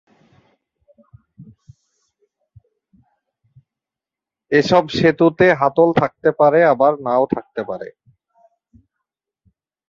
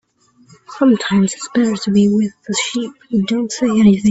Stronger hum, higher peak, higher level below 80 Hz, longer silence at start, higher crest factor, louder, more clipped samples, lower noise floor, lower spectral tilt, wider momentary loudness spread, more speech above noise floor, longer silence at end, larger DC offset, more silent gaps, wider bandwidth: neither; about the same, -2 dBFS vs 0 dBFS; about the same, -56 dBFS vs -52 dBFS; first, 1.4 s vs 0.7 s; about the same, 18 dB vs 14 dB; about the same, -16 LUFS vs -16 LUFS; neither; first, -88 dBFS vs -52 dBFS; first, -7 dB/octave vs -5.5 dB/octave; first, 14 LU vs 7 LU; first, 73 dB vs 37 dB; first, 2 s vs 0 s; neither; neither; second, 7.4 kHz vs 8.2 kHz